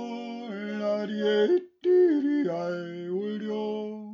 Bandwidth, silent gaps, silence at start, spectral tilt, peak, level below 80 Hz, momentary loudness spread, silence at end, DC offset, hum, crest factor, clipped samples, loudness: 6.8 kHz; none; 0 s; -7 dB/octave; -14 dBFS; -84 dBFS; 13 LU; 0 s; under 0.1%; none; 14 dB; under 0.1%; -27 LUFS